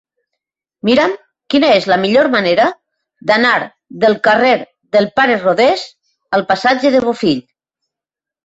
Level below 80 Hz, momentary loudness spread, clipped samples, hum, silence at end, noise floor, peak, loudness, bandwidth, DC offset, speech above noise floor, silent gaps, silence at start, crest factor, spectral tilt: -56 dBFS; 9 LU; under 0.1%; none; 1.05 s; -87 dBFS; 0 dBFS; -13 LUFS; 8 kHz; under 0.1%; 74 dB; none; 0.85 s; 14 dB; -5 dB/octave